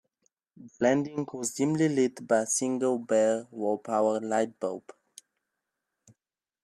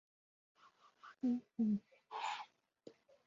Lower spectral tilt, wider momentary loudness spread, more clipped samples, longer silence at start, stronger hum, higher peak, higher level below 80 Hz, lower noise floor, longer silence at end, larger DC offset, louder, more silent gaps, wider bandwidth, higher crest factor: about the same, -5 dB/octave vs -5 dB/octave; second, 8 LU vs 24 LU; neither; second, 0.6 s vs 1.05 s; neither; first, -10 dBFS vs -28 dBFS; first, -76 dBFS vs -88 dBFS; first, -89 dBFS vs -66 dBFS; first, 1.85 s vs 0.35 s; neither; first, -28 LUFS vs -42 LUFS; neither; first, 14.5 kHz vs 7.4 kHz; about the same, 18 dB vs 16 dB